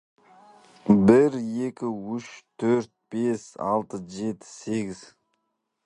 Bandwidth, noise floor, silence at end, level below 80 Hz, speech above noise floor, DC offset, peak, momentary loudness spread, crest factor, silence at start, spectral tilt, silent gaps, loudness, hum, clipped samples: 10.5 kHz; -78 dBFS; 0.9 s; -60 dBFS; 53 dB; under 0.1%; -2 dBFS; 18 LU; 24 dB; 0.85 s; -7.5 dB/octave; none; -25 LUFS; none; under 0.1%